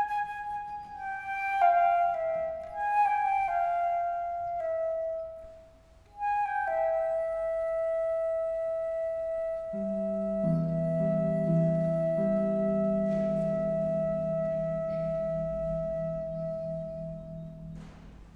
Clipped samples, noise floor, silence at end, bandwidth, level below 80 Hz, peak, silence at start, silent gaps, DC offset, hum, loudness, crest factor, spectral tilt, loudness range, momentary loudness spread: under 0.1%; -56 dBFS; 0 s; 6.8 kHz; -54 dBFS; -14 dBFS; 0 s; none; under 0.1%; none; -30 LUFS; 16 dB; -9 dB/octave; 4 LU; 11 LU